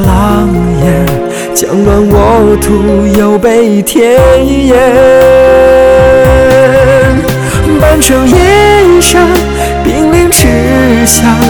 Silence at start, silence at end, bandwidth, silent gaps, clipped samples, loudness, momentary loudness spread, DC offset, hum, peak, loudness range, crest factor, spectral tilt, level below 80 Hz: 0 s; 0 s; over 20 kHz; none; 5%; -5 LUFS; 6 LU; 0.8%; none; 0 dBFS; 3 LU; 6 dB; -5 dB/octave; -16 dBFS